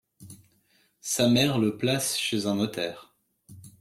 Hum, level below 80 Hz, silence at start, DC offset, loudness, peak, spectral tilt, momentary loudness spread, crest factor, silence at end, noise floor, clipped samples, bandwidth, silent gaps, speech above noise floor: none; -62 dBFS; 0.2 s; under 0.1%; -25 LUFS; -8 dBFS; -4 dB/octave; 12 LU; 20 dB; 0.1 s; -66 dBFS; under 0.1%; 16 kHz; none; 41 dB